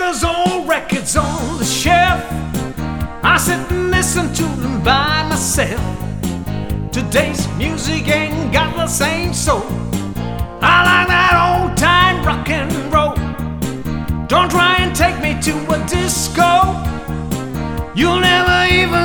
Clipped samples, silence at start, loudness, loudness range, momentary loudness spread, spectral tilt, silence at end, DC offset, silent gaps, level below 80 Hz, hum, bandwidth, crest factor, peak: under 0.1%; 0 s; -15 LUFS; 4 LU; 11 LU; -4 dB/octave; 0 s; under 0.1%; none; -28 dBFS; none; over 20 kHz; 16 dB; 0 dBFS